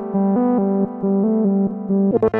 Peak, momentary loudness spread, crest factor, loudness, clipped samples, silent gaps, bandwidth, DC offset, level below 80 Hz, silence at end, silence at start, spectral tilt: -6 dBFS; 3 LU; 12 dB; -18 LUFS; under 0.1%; none; 2.6 kHz; under 0.1%; -52 dBFS; 0 s; 0 s; -12.5 dB/octave